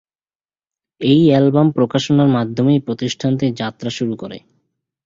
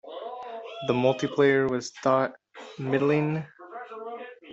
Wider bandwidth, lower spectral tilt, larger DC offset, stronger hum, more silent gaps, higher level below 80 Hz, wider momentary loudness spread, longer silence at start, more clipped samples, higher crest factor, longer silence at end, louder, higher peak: about the same, 7.6 kHz vs 8 kHz; about the same, -7 dB/octave vs -6 dB/octave; neither; neither; neither; first, -56 dBFS vs -68 dBFS; second, 11 LU vs 19 LU; first, 1 s vs 0.05 s; neither; about the same, 16 dB vs 18 dB; first, 0.65 s vs 0 s; first, -16 LUFS vs -26 LUFS; first, -2 dBFS vs -10 dBFS